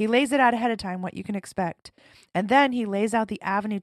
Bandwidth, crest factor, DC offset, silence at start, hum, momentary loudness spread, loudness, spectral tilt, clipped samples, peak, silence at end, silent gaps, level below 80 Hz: 13 kHz; 18 dB; under 0.1%; 0 s; none; 11 LU; -24 LUFS; -5 dB/octave; under 0.1%; -8 dBFS; 0 s; none; -62 dBFS